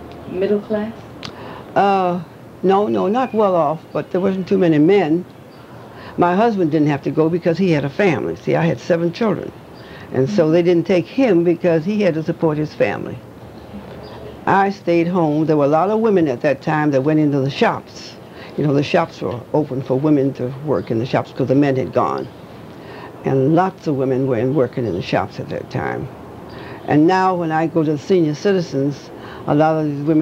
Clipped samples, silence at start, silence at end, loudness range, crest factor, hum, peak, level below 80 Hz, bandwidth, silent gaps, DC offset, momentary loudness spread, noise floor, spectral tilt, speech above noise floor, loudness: under 0.1%; 0 s; 0 s; 3 LU; 16 dB; none; -2 dBFS; -54 dBFS; 8.6 kHz; none; under 0.1%; 19 LU; -38 dBFS; -8 dB/octave; 21 dB; -18 LUFS